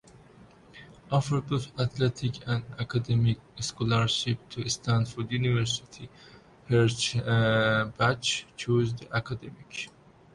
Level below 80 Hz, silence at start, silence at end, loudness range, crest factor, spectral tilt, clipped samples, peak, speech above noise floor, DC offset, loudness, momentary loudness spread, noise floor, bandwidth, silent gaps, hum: -54 dBFS; 0.75 s; 0.45 s; 3 LU; 16 dB; -5 dB/octave; under 0.1%; -12 dBFS; 26 dB; under 0.1%; -28 LUFS; 14 LU; -54 dBFS; 11.5 kHz; none; none